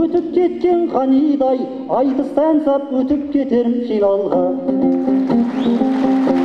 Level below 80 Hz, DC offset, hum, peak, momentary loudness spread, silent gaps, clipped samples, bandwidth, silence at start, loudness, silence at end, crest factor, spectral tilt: -52 dBFS; under 0.1%; none; -2 dBFS; 3 LU; none; under 0.1%; 6.2 kHz; 0 s; -16 LUFS; 0 s; 14 dB; -8 dB/octave